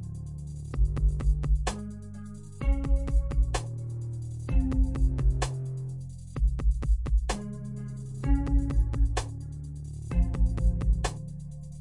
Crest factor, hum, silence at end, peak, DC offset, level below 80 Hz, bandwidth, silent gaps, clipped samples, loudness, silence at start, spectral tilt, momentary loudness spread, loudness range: 14 dB; none; 0 s; -14 dBFS; 0.1%; -28 dBFS; 11 kHz; none; under 0.1%; -31 LUFS; 0 s; -6.5 dB/octave; 12 LU; 2 LU